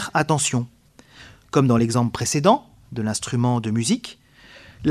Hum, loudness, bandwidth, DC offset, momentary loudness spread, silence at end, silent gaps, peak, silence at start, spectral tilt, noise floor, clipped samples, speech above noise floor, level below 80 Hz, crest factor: none; -21 LUFS; 14.5 kHz; under 0.1%; 9 LU; 0 s; none; -2 dBFS; 0 s; -5 dB/octave; -49 dBFS; under 0.1%; 28 dB; -54 dBFS; 20 dB